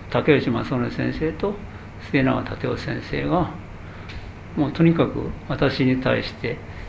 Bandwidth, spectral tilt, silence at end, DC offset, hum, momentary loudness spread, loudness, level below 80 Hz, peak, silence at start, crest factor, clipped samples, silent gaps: 8 kHz; -8 dB/octave; 0 s; under 0.1%; none; 18 LU; -23 LUFS; -40 dBFS; -2 dBFS; 0 s; 20 dB; under 0.1%; none